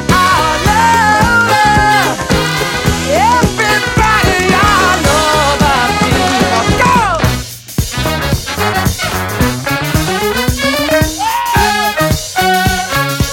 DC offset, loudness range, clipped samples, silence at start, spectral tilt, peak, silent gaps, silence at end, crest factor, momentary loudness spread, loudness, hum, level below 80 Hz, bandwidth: under 0.1%; 4 LU; under 0.1%; 0 s; -4 dB/octave; 0 dBFS; none; 0 s; 12 dB; 6 LU; -11 LUFS; none; -24 dBFS; 17 kHz